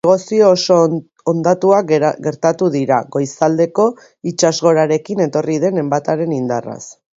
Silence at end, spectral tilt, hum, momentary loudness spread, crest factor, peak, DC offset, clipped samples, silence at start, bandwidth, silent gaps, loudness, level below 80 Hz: 0.25 s; -5.5 dB/octave; none; 9 LU; 14 dB; 0 dBFS; under 0.1%; under 0.1%; 0.05 s; 7.8 kHz; none; -15 LUFS; -60 dBFS